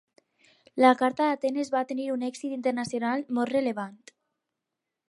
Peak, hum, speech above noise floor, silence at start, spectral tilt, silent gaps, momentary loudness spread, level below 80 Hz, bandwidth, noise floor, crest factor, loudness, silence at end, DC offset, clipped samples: -6 dBFS; none; 59 dB; 0.75 s; -4.5 dB/octave; none; 11 LU; -78 dBFS; 11.5 kHz; -86 dBFS; 22 dB; -27 LUFS; 1.15 s; under 0.1%; under 0.1%